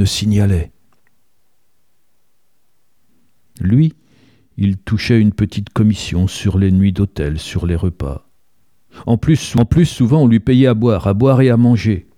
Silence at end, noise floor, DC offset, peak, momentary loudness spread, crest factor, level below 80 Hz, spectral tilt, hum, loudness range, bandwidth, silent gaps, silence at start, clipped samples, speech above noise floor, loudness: 0.15 s; -67 dBFS; 0.2%; 0 dBFS; 10 LU; 14 dB; -34 dBFS; -7 dB/octave; none; 9 LU; 14 kHz; none; 0 s; under 0.1%; 53 dB; -15 LUFS